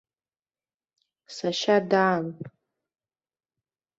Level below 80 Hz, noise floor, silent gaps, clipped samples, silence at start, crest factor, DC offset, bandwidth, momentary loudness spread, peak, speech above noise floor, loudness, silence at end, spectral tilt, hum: -74 dBFS; under -90 dBFS; none; under 0.1%; 1.3 s; 20 dB; under 0.1%; 8 kHz; 21 LU; -8 dBFS; over 66 dB; -24 LUFS; 1.5 s; -5 dB/octave; none